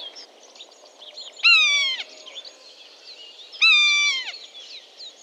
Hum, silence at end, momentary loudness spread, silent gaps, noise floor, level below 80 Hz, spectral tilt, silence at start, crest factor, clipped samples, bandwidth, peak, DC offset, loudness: none; 0.15 s; 26 LU; none; -47 dBFS; under -90 dBFS; 6 dB/octave; 0 s; 18 dB; under 0.1%; 10.5 kHz; -6 dBFS; under 0.1%; -16 LUFS